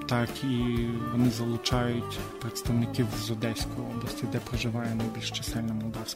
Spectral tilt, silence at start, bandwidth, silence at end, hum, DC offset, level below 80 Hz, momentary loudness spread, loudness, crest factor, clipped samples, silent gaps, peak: -5.5 dB/octave; 0 s; 16 kHz; 0 s; none; under 0.1%; -44 dBFS; 7 LU; -30 LUFS; 20 dB; under 0.1%; none; -10 dBFS